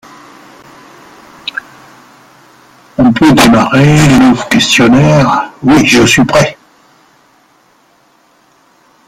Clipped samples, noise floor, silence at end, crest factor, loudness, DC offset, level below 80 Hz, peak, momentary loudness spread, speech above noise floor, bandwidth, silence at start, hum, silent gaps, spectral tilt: under 0.1%; -49 dBFS; 2.55 s; 10 dB; -7 LUFS; under 0.1%; -36 dBFS; 0 dBFS; 16 LU; 42 dB; 16 kHz; 1.55 s; none; none; -5 dB/octave